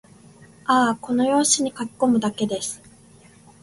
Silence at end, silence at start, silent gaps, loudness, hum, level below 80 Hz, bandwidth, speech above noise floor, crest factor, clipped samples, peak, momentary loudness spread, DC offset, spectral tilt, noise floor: 0.85 s; 0.65 s; none; -21 LUFS; none; -60 dBFS; 11.5 kHz; 29 dB; 18 dB; under 0.1%; -4 dBFS; 12 LU; under 0.1%; -3 dB/octave; -50 dBFS